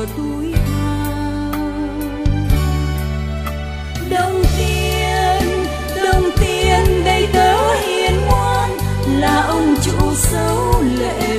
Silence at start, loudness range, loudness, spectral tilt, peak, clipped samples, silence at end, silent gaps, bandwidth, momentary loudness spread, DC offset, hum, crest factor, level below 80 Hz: 0 s; 5 LU; -17 LUFS; -5 dB/octave; 0 dBFS; under 0.1%; 0 s; none; 15.5 kHz; 8 LU; under 0.1%; none; 16 dB; -22 dBFS